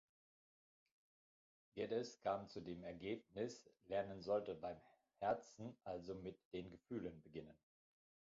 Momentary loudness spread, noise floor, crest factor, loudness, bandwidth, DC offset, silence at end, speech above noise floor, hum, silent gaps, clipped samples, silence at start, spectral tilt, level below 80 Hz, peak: 13 LU; under -90 dBFS; 20 dB; -48 LUFS; 7.4 kHz; under 0.1%; 0.8 s; over 43 dB; none; 6.45-6.51 s; under 0.1%; 1.75 s; -5 dB/octave; -76 dBFS; -30 dBFS